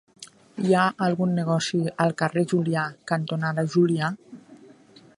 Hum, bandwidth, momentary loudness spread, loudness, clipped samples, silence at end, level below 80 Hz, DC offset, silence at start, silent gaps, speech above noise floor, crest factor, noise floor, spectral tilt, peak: none; 11.5 kHz; 7 LU; -24 LUFS; under 0.1%; 0.65 s; -70 dBFS; under 0.1%; 0.2 s; none; 28 dB; 18 dB; -52 dBFS; -6 dB/octave; -6 dBFS